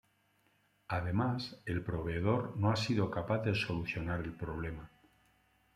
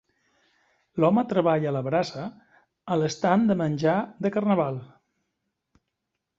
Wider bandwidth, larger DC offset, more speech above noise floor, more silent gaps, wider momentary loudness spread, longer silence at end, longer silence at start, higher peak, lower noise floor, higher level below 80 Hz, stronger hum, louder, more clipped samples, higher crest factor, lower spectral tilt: first, 12 kHz vs 7.6 kHz; neither; second, 38 dB vs 58 dB; neither; second, 8 LU vs 15 LU; second, 0.9 s vs 1.55 s; about the same, 0.9 s vs 0.95 s; second, -16 dBFS vs -6 dBFS; second, -73 dBFS vs -82 dBFS; first, -56 dBFS vs -66 dBFS; first, 50 Hz at -55 dBFS vs none; second, -36 LUFS vs -24 LUFS; neither; about the same, 20 dB vs 20 dB; about the same, -7 dB/octave vs -7 dB/octave